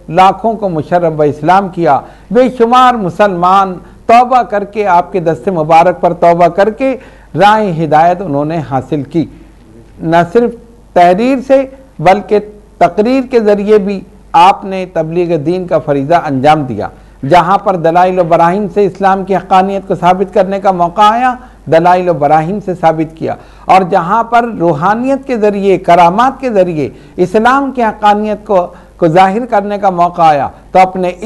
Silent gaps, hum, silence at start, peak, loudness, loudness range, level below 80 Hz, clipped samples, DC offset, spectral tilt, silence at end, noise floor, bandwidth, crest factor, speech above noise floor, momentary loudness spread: none; none; 0.1 s; 0 dBFS; -10 LUFS; 2 LU; -40 dBFS; 1%; under 0.1%; -7 dB/octave; 0 s; -37 dBFS; 12 kHz; 10 dB; 27 dB; 8 LU